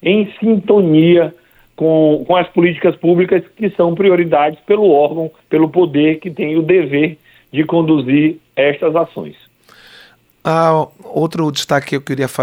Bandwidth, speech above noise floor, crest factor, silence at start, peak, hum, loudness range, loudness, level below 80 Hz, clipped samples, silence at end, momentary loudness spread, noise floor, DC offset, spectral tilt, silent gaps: 15.5 kHz; 33 dB; 14 dB; 0.05 s; 0 dBFS; none; 5 LU; -14 LUFS; -56 dBFS; under 0.1%; 0 s; 8 LU; -46 dBFS; under 0.1%; -7 dB/octave; none